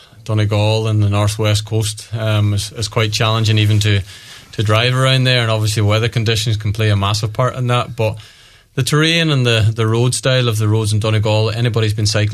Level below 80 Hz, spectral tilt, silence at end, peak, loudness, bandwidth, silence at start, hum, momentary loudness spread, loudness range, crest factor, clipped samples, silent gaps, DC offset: -44 dBFS; -5 dB/octave; 0 s; -2 dBFS; -15 LUFS; 13.5 kHz; 0.2 s; none; 7 LU; 2 LU; 14 dB; under 0.1%; none; under 0.1%